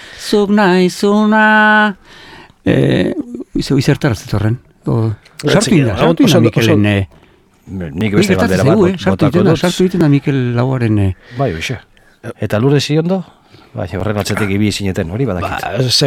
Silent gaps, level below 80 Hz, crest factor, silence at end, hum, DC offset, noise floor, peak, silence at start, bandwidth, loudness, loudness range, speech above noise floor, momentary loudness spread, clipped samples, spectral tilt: none; -40 dBFS; 14 dB; 0 s; none; under 0.1%; -48 dBFS; 0 dBFS; 0 s; 16.5 kHz; -13 LUFS; 4 LU; 35 dB; 12 LU; under 0.1%; -6 dB/octave